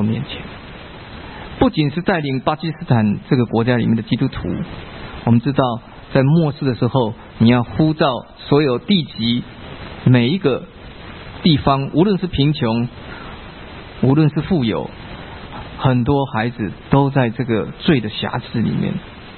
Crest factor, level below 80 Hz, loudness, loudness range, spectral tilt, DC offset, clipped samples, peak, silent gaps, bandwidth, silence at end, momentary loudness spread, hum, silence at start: 18 dB; -40 dBFS; -18 LUFS; 3 LU; -12.5 dB/octave; under 0.1%; under 0.1%; 0 dBFS; none; 4.4 kHz; 0 s; 19 LU; none; 0 s